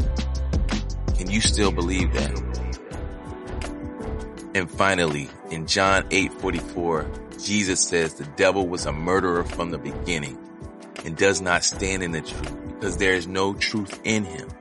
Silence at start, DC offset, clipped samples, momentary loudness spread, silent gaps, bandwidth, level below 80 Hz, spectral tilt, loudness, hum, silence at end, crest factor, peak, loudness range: 0 s; under 0.1%; under 0.1%; 14 LU; none; 11.5 kHz; -32 dBFS; -4 dB/octave; -24 LUFS; none; 0 s; 22 dB; -2 dBFS; 4 LU